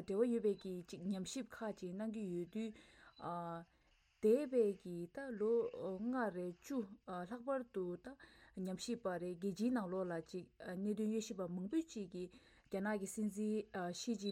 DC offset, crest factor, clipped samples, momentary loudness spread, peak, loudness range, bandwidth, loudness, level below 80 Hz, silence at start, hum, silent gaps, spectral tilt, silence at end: under 0.1%; 18 dB; under 0.1%; 12 LU; -24 dBFS; 5 LU; 15 kHz; -42 LUFS; -76 dBFS; 0 s; none; none; -6 dB/octave; 0 s